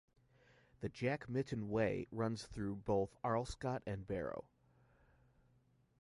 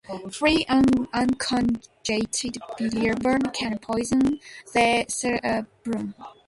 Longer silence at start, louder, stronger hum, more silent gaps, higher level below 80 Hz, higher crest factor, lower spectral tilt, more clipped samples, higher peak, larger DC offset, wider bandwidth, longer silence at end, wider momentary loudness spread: first, 0.8 s vs 0.1 s; second, -41 LUFS vs -24 LUFS; neither; neither; second, -62 dBFS vs -50 dBFS; about the same, 18 dB vs 18 dB; first, -7 dB/octave vs -4 dB/octave; neither; second, -24 dBFS vs -6 dBFS; neither; about the same, 11.5 kHz vs 11.5 kHz; first, 1.6 s vs 0.15 s; second, 7 LU vs 10 LU